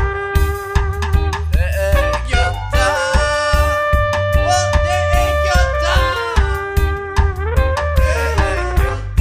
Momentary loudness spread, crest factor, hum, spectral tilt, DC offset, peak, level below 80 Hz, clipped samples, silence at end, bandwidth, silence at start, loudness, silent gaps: 4 LU; 14 dB; none; -5 dB/octave; under 0.1%; -2 dBFS; -18 dBFS; under 0.1%; 0 s; 15.5 kHz; 0 s; -16 LUFS; none